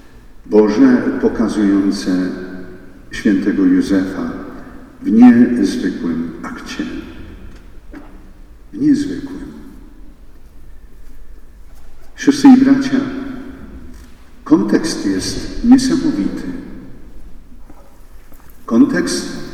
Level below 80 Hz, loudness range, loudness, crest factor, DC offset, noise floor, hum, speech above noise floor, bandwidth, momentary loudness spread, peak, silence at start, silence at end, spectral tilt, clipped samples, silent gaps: -36 dBFS; 9 LU; -14 LUFS; 16 dB; under 0.1%; -37 dBFS; none; 23 dB; 12.5 kHz; 24 LU; 0 dBFS; 0.05 s; 0 s; -5.5 dB/octave; under 0.1%; none